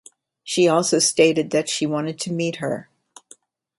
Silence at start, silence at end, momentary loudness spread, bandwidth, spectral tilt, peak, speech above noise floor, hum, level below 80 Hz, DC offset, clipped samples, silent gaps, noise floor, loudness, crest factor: 0.45 s; 0.95 s; 11 LU; 12 kHz; -3.5 dB/octave; -4 dBFS; 32 dB; none; -66 dBFS; under 0.1%; under 0.1%; none; -52 dBFS; -20 LUFS; 18 dB